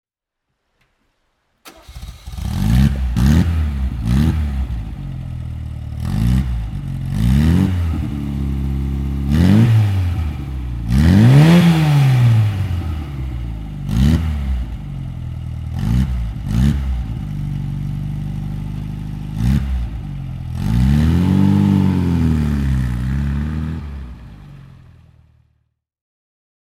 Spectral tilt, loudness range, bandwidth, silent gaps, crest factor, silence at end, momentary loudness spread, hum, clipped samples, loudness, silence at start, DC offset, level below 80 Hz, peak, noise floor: -7.5 dB/octave; 9 LU; 15 kHz; none; 16 dB; 2.05 s; 15 LU; none; under 0.1%; -18 LUFS; 1.65 s; under 0.1%; -24 dBFS; 0 dBFS; -77 dBFS